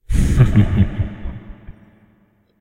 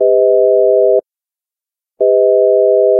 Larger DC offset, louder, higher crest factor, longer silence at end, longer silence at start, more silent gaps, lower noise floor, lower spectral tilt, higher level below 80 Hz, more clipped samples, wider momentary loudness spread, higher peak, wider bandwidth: neither; second, -17 LUFS vs -11 LUFS; first, 18 dB vs 10 dB; first, 0.9 s vs 0 s; about the same, 0.1 s vs 0 s; neither; second, -57 dBFS vs -89 dBFS; second, -8 dB/octave vs -12.5 dB/octave; first, -24 dBFS vs -80 dBFS; neither; first, 19 LU vs 4 LU; about the same, 0 dBFS vs -2 dBFS; first, 13.5 kHz vs 0.9 kHz